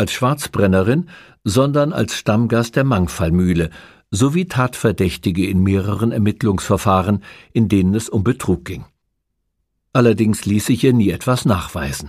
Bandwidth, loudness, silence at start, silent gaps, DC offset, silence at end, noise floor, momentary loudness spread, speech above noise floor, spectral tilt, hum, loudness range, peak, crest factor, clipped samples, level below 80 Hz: 15.5 kHz; -17 LUFS; 0 s; none; under 0.1%; 0 s; -73 dBFS; 6 LU; 56 dB; -6.5 dB/octave; none; 2 LU; 0 dBFS; 16 dB; under 0.1%; -40 dBFS